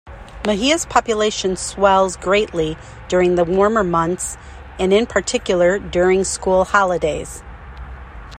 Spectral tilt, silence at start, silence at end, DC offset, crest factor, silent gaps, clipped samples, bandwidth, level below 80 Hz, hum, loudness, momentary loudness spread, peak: -4 dB/octave; 0.05 s; 0 s; under 0.1%; 18 dB; none; under 0.1%; 15 kHz; -38 dBFS; none; -17 LUFS; 19 LU; 0 dBFS